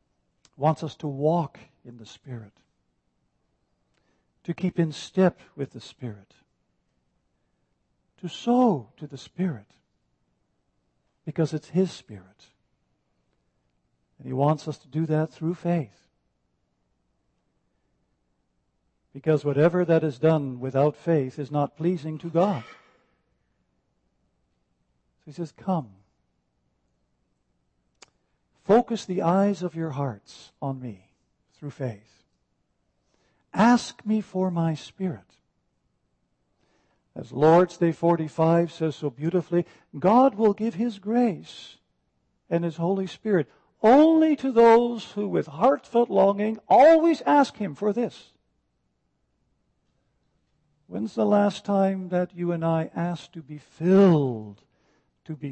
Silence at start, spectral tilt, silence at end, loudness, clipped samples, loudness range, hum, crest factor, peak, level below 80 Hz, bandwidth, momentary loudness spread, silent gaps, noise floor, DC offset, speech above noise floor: 0.6 s; -7.5 dB/octave; 0 s; -24 LUFS; under 0.1%; 16 LU; none; 18 dB; -8 dBFS; -68 dBFS; 8.6 kHz; 20 LU; none; -74 dBFS; under 0.1%; 50 dB